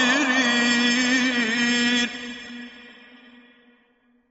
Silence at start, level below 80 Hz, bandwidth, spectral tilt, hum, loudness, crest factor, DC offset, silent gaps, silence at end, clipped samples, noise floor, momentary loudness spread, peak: 0 s; -64 dBFS; 8.2 kHz; -1.5 dB/octave; none; -20 LUFS; 18 dB; under 0.1%; none; 1.4 s; under 0.1%; -63 dBFS; 18 LU; -6 dBFS